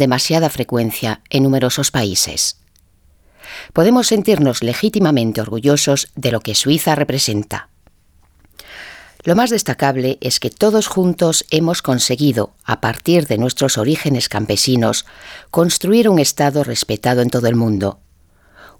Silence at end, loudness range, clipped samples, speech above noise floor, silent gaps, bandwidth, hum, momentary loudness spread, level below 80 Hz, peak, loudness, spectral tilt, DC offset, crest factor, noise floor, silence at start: 0.15 s; 3 LU; under 0.1%; 37 dB; none; over 20 kHz; none; 8 LU; -48 dBFS; 0 dBFS; -15 LUFS; -4.5 dB/octave; under 0.1%; 16 dB; -53 dBFS; 0 s